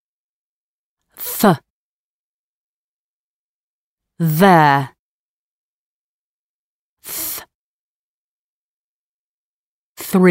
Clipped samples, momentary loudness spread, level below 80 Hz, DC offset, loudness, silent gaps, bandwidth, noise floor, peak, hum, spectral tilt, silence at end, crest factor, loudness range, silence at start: under 0.1%; 18 LU; -60 dBFS; under 0.1%; -16 LUFS; 1.70-3.98 s, 4.99-6.97 s, 7.55-9.96 s; 16.5 kHz; under -90 dBFS; 0 dBFS; none; -5.5 dB/octave; 0 s; 20 dB; 13 LU; 1.2 s